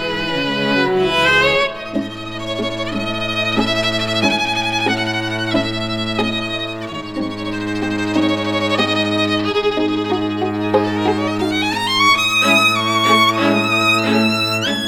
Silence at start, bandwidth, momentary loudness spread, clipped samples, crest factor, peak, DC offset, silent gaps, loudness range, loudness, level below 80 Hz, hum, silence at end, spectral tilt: 0 s; 19 kHz; 10 LU; under 0.1%; 16 dB; -2 dBFS; under 0.1%; none; 6 LU; -16 LUFS; -44 dBFS; none; 0 s; -4 dB/octave